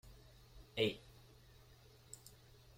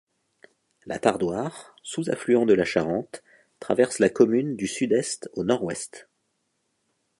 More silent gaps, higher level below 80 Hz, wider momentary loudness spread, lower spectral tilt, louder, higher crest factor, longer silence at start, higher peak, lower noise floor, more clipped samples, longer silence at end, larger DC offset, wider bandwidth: neither; about the same, -66 dBFS vs -62 dBFS; first, 25 LU vs 16 LU; about the same, -4.5 dB/octave vs -5 dB/octave; second, -41 LUFS vs -24 LUFS; about the same, 26 dB vs 22 dB; second, 0.05 s vs 0.85 s; second, -20 dBFS vs -4 dBFS; second, -64 dBFS vs -74 dBFS; neither; second, 0.6 s vs 1.2 s; neither; first, 16.5 kHz vs 11.5 kHz